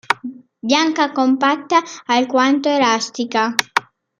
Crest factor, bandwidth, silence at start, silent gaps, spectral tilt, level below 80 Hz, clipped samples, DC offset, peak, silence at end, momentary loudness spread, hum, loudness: 18 dB; 15.5 kHz; 0.1 s; none; -2.5 dB/octave; -66 dBFS; under 0.1%; under 0.1%; 0 dBFS; 0.4 s; 7 LU; none; -17 LUFS